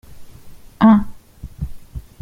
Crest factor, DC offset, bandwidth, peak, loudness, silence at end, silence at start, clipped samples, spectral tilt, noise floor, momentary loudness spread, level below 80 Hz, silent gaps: 18 dB; under 0.1%; 5.2 kHz; -2 dBFS; -14 LUFS; 0.2 s; 0.1 s; under 0.1%; -8.5 dB/octave; -38 dBFS; 24 LU; -36 dBFS; none